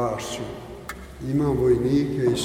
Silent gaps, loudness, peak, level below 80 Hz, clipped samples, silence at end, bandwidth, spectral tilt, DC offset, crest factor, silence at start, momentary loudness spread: none; -23 LUFS; -10 dBFS; -42 dBFS; under 0.1%; 0 s; 16 kHz; -6.5 dB/octave; under 0.1%; 14 dB; 0 s; 16 LU